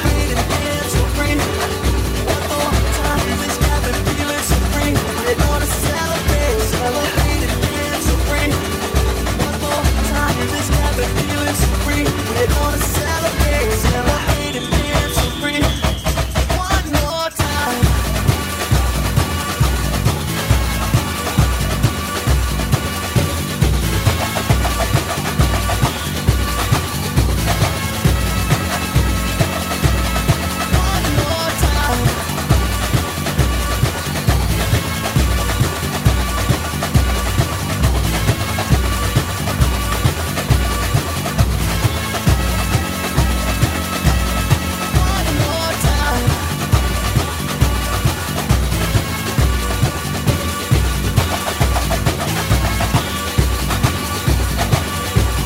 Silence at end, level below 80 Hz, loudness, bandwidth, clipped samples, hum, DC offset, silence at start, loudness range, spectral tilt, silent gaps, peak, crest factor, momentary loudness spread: 0 s; -22 dBFS; -17 LUFS; 16.5 kHz; under 0.1%; none; under 0.1%; 0 s; 1 LU; -4.5 dB/octave; none; 0 dBFS; 16 dB; 2 LU